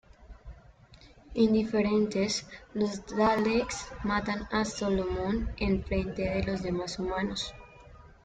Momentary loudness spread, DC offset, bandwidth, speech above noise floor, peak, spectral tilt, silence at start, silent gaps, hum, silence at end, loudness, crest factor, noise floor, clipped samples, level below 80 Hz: 9 LU; under 0.1%; 9.2 kHz; 26 dB; -12 dBFS; -5 dB/octave; 0.2 s; none; none; 0.15 s; -30 LUFS; 18 dB; -55 dBFS; under 0.1%; -46 dBFS